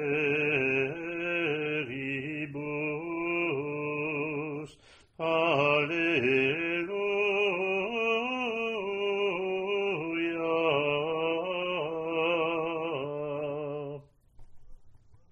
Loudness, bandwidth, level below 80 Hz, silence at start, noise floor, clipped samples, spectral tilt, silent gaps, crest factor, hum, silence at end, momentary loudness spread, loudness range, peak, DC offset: -29 LUFS; 8.6 kHz; -64 dBFS; 0 s; -57 dBFS; under 0.1%; -6.5 dB/octave; none; 18 dB; none; 0.15 s; 9 LU; 5 LU; -12 dBFS; under 0.1%